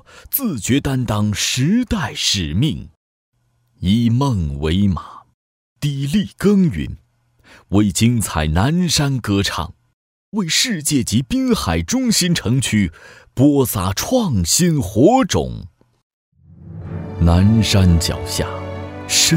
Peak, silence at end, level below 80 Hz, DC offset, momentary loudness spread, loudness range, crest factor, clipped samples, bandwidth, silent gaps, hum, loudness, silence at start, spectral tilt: 0 dBFS; 0 s; -34 dBFS; under 0.1%; 13 LU; 4 LU; 16 dB; under 0.1%; 16.5 kHz; 2.97-3.32 s, 5.34-5.76 s, 9.93-10.32 s, 16.03-16.32 s; none; -17 LUFS; 0.15 s; -4.5 dB/octave